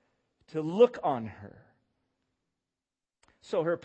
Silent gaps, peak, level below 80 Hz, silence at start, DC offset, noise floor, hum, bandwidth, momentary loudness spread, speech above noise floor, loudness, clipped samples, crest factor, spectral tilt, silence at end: none; -10 dBFS; -74 dBFS; 0.55 s; under 0.1%; under -90 dBFS; none; 8.2 kHz; 17 LU; over 62 dB; -29 LUFS; under 0.1%; 22 dB; -7 dB/octave; 0.05 s